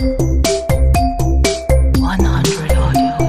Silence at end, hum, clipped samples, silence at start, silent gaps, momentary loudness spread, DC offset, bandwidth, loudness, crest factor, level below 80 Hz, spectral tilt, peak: 0 s; none; under 0.1%; 0 s; none; 2 LU; 3%; 15.5 kHz; -15 LUFS; 12 dB; -16 dBFS; -5.5 dB/octave; 0 dBFS